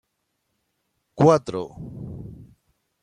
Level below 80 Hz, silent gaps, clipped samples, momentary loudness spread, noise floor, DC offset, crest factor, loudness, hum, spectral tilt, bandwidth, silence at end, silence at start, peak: -56 dBFS; none; under 0.1%; 21 LU; -75 dBFS; under 0.1%; 22 dB; -20 LUFS; none; -7.5 dB/octave; 10.5 kHz; 0.7 s; 1.15 s; -4 dBFS